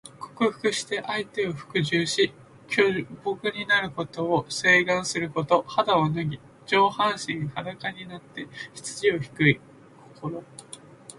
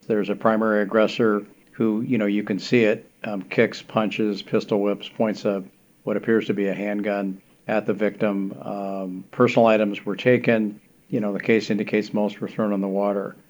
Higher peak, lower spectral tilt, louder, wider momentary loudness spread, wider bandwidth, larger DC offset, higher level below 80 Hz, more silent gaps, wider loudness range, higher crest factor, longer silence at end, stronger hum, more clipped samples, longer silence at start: second, -6 dBFS vs -2 dBFS; second, -4.5 dB/octave vs -7 dB/octave; about the same, -25 LUFS vs -23 LUFS; first, 16 LU vs 10 LU; second, 11.5 kHz vs over 20 kHz; neither; first, -62 dBFS vs -72 dBFS; neither; about the same, 5 LU vs 3 LU; about the same, 20 dB vs 20 dB; about the same, 0.05 s vs 0.15 s; neither; neither; about the same, 0.05 s vs 0.1 s